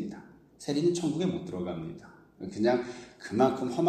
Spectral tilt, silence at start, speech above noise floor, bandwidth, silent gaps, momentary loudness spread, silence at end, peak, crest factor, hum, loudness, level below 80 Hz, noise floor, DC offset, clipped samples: -6 dB/octave; 0 s; 21 dB; 12.5 kHz; none; 17 LU; 0 s; -10 dBFS; 20 dB; none; -30 LUFS; -64 dBFS; -51 dBFS; under 0.1%; under 0.1%